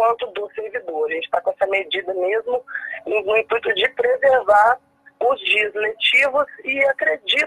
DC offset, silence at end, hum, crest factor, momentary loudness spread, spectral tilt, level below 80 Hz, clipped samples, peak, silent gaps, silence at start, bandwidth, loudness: under 0.1%; 0 s; none; 16 dB; 11 LU; -2.5 dB/octave; -62 dBFS; under 0.1%; -4 dBFS; none; 0 s; 13.5 kHz; -19 LUFS